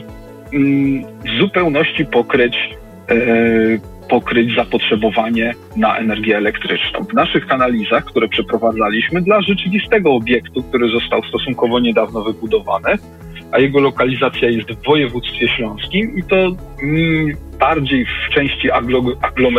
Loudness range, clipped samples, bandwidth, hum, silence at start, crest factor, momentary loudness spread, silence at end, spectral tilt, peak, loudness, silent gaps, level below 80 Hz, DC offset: 1 LU; under 0.1%; 13 kHz; none; 0 s; 14 dB; 6 LU; 0 s; -7 dB/octave; -2 dBFS; -15 LUFS; none; -38 dBFS; under 0.1%